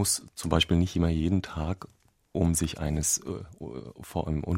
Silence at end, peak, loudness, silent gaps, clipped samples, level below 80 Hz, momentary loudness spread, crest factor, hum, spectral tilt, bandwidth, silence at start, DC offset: 0 s; -6 dBFS; -28 LUFS; none; under 0.1%; -40 dBFS; 14 LU; 22 dB; none; -4.5 dB/octave; 16 kHz; 0 s; under 0.1%